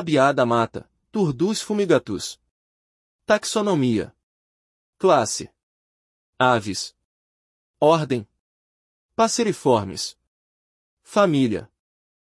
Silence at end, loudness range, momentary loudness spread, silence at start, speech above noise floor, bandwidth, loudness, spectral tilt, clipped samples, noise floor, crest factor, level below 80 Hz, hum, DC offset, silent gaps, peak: 0.65 s; 1 LU; 13 LU; 0 s; over 70 dB; 12 kHz; -21 LUFS; -5 dB/octave; under 0.1%; under -90 dBFS; 20 dB; -62 dBFS; none; under 0.1%; 2.51-3.19 s, 4.23-4.93 s, 5.63-6.33 s, 7.05-7.74 s, 8.40-9.09 s, 10.27-10.97 s; -4 dBFS